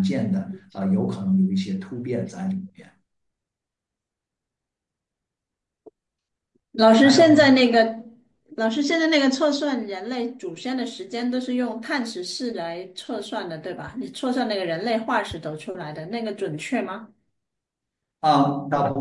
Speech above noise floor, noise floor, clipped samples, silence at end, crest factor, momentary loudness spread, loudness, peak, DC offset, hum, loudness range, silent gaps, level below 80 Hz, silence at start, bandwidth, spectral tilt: 64 dB; -86 dBFS; under 0.1%; 0 s; 20 dB; 18 LU; -22 LUFS; -4 dBFS; under 0.1%; none; 12 LU; none; -64 dBFS; 0 s; 11.5 kHz; -5.5 dB/octave